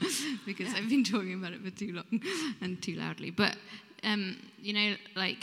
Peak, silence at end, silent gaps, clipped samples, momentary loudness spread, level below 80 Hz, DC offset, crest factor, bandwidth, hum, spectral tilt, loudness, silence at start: -10 dBFS; 0 s; none; under 0.1%; 11 LU; -82 dBFS; under 0.1%; 24 dB; 16 kHz; none; -3.5 dB/octave; -33 LUFS; 0 s